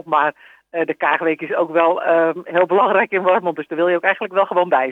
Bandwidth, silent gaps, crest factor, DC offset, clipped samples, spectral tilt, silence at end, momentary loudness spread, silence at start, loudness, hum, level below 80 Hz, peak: 4 kHz; none; 16 dB; under 0.1%; under 0.1%; -7 dB/octave; 0 s; 6 LU; 0.05 s; -17 LUFS; none; -78 dBFS; -2 dBFS